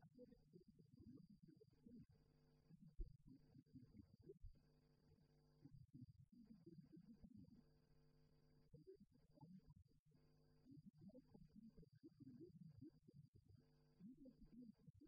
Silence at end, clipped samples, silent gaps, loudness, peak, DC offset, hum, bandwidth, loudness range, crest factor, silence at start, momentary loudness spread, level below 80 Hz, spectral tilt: 0 s; under 0.1%; 9.99-10.06 s, 13.28-13.33 s, 14.90-14.94 s; -67 LUFS; -42 dBFS; under 0.1%; none; 5 kHz; 2 LU; 26 dB; 0 s; 5 LU; -72 dBFS; -9 dB/octave